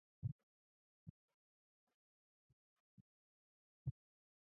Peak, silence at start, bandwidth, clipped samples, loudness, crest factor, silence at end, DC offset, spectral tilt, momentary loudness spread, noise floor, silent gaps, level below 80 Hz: -34 dBFS; 0.25 s; 1.3 kHz; under 0.1%; -52 LUFS; 24 dB; 0.55 s; under 0.1%; -17 dB/octave; 14 LU; under -90 dBFS; 0.32-1.28 s, 1.34-1.87 s, 1.94-3.85 s; -72 dBFS